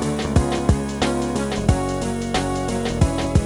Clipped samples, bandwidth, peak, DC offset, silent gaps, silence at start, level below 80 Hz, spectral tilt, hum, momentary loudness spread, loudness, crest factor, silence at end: under 0.1%; 12.5 kHz; -2 dBFS; under 0.1%; none; 0 s; -28 dBFS; -6 dB/octave; none; 4 LU; -22 LUFS; 18 dB; 0 s